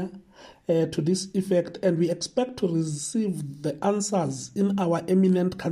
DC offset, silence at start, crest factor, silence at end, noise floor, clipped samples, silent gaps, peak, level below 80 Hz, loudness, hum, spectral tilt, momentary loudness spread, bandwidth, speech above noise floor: under 0.1%; 0 s; 14 dB; 0 s; -50 dBFS; under 0.1%; none; -12 dBFS; -62 dBFS; -25 LUFS; none; -6 dB/octave; 7 LU; 13 kHz; 25 dB